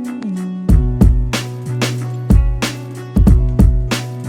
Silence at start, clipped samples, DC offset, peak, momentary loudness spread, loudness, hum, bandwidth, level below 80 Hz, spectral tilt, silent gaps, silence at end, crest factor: 0 s; under 0.1%; under 0.1%; 0 dBFS; 10 LU; -16 LUFS; none; 15.5 kHz; -16 dBFS; -6.5 dB/octave; none; 0 s; 14 dB